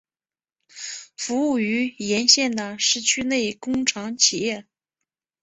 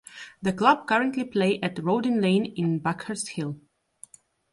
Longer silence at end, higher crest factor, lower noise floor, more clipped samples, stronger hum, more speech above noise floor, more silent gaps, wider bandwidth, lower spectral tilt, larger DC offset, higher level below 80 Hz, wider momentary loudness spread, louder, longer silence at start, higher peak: second, 0.8 s vs 0.95 s; about the same, 22 dB vs 20 dB; first, under -90 dBFS vs -52 dBFS; neither; neither; first, over 68 dB vs 28 dB; neither; second, 8.2 kHz vs 11.5 kHz; second, -1.5 dB/octave vs -5.5 dB/octave; neither; about the same, -62 dBFS vs -66 dBFS; first, 17 LU vs 11 LU; first, -21 LUFS vs -25 LUFS; first, 0.75 s vs 0.15 s; first, -2 dBFS vs -6 dBFS